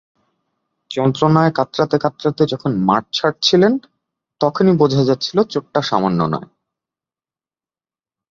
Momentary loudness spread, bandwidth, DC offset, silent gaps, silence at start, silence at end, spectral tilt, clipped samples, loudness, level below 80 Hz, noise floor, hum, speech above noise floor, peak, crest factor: 7 LU; 7.6 kHz; under 0.1%; none; 0.9 s; 1.9 s; -6.5 dB/octave; under 0.1%; -17 LUFS; -56 dBFS; under -90 dBFS; none; over 74 dB; -2 dBFS; 16 dB